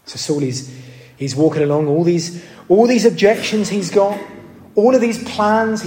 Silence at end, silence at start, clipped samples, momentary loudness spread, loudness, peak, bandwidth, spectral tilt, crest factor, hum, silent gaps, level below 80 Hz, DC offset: 0 s; 0.05 s; under 0.1%; 14 LU; -16 LUFS; -2 dBFS; 16.5 kHz; -5.5 dB/octave; 16 dB; none; none; -58 dBFS; under 0.1%